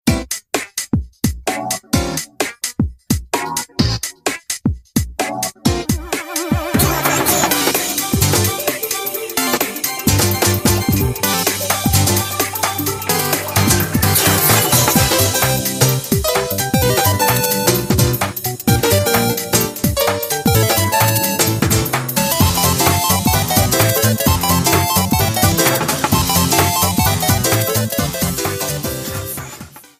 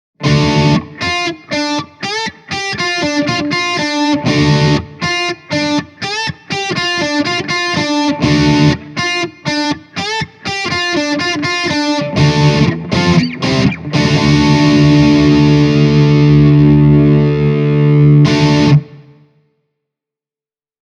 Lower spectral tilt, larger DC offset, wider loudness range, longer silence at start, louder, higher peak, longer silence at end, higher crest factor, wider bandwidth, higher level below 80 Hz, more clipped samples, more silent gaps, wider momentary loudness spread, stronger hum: second, -3.5 dB/octave vs -6 dB/octave; neither; about the same, 6 LU vs 6 LU; second, 0.05 s vs 0.2 s; second, -15 LUFS vs -12 LUFS; about the same, 0 dBFS vs 0 dBFS; second, 0.2 s vs 1.8 s; about the same, 16 dB vs 12 dB; first, 16 kHz vs 9.4 kHz; about the same, -32 dBFS vs -34 dBFS; neither; neither; about the same, 8 LU vs 10 LU; neither